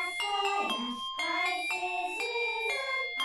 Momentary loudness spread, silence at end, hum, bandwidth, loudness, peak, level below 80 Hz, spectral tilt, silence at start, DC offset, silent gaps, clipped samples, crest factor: 3 LU; 0 s; none; over 20 kHz; -31 LUFS; -18 dBFS; -72 dBFS; -0.5 dB/octave; 0 s; under 0.1%; none; under 0.1%; 14 dB